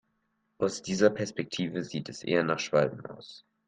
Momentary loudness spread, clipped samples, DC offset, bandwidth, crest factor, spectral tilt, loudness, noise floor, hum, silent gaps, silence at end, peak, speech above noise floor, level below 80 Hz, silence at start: 17 LU; under 0.1%; under 0.1%; 9.6 kHz; 22 dB; -5 dB/octave; -29 LUFS; -76 dBFS; none; none; 0.3 s; -8 dBFS; 47 dB; -68 dBFS; 0.6 s